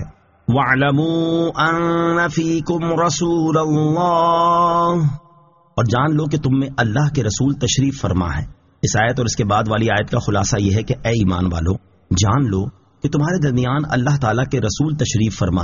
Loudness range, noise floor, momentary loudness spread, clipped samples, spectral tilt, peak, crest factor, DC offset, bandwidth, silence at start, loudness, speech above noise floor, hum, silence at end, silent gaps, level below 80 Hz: 2 LU; -51 dBFS; 7 LU; under 0.1%; -5.5 dB/octave; -2 dBFS; 14 dB; under 0.1%; 7.4 kHz; 0 s; -18 LUFS; 34 dB; none; 0 s; none; -38 dBFS